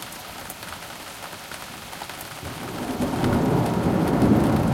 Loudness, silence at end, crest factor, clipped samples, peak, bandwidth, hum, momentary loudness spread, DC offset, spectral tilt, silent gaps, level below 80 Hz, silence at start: -24 LUFS; 0 s; 18 dB; under 0.1%; -8 dBFS; 17 kHz; none; 16 LU; under 0.1%; -6.5 dB/octave; none; -42 dBFS; 0 s